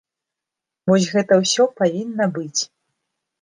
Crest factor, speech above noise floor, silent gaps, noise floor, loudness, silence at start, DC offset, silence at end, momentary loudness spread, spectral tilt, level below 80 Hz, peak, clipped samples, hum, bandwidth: 18 dB; 67 dB; none; -85 dBFS; -19 LUFS; 0.85 s; under 0.1%; 0.75 s; 8 LU; -4.5 dB/octave; -66 dBFS; -2 dBFS; under 0.1%; none; 10 kHz